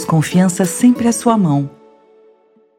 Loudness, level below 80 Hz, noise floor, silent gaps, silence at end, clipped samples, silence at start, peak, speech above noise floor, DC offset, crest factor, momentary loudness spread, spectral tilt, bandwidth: -14 LUFS; -54 dBFS; -52 dBFS; none; 1.1 s; under 0.1%; 0 s; 0 dBFS; 39 dB; under 0.1%; 16 dB; 5 LU; -6 dB/octave; 16.5 kHz